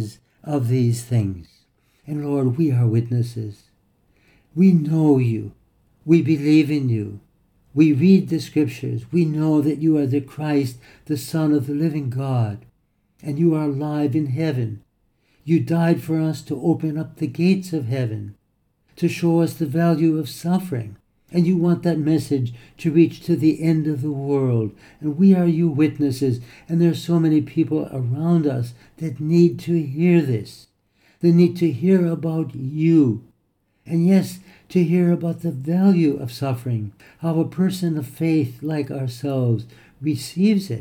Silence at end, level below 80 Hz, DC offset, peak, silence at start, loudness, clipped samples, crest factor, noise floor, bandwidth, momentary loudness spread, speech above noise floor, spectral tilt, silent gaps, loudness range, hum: 0 s; -60 dBFS; under 0.1%; -4 dBFS; 0 s; -20 LUFS; under 0.1%; 16 dB; -67 dBFS; 16 kHz; 12 LU; 47 dB; -8 dB/octave; none; 4 LU; none